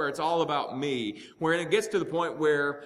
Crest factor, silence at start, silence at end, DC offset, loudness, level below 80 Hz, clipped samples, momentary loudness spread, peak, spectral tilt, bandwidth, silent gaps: 18 dB; 0 s; 0 s; under 0.1%; -28 LUFS; -72 dBFS; under 0.1%; 6 LU; -10 dBFS; -4.5 dB/octave; 14 kHz; none